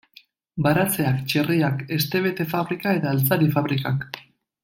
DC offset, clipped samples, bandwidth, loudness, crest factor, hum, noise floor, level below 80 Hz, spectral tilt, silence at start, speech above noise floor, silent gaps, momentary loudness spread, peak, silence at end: under 0.1%; under 0.1%; 17 kHz; -22 LUFS; 18 dB; none; -54 dBFS; -58 dBFS; -6 dB/octave; 0.55 s; 32 dB; none; 7 LU; -4 dBFS; 0.45 s